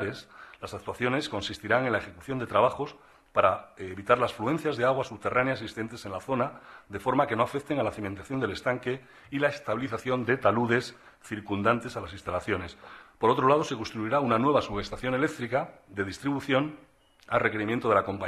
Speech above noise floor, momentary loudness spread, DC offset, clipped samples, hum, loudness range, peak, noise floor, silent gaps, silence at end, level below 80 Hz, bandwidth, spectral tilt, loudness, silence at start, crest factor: 19 dB; 13 LU; under 0.1%; under 0.1%; none; 3 LU; -8 dBFS; -47 dBFS; none; 0 s; -58 dBFS; 14 kHz; -6 dB/octave; -28 LUFS; 0 s; 20 dB